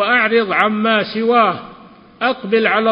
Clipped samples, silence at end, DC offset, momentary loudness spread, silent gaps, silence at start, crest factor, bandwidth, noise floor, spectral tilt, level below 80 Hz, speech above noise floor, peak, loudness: under 0.1%; 0 s; under 0.1%; 7 LU; none; 0 s; 16 dB; 5.4 kHz; -41 dBFS; -7 dB/octave; -60 dBFS; 26 dB; 0 dBFS; -15 LUFS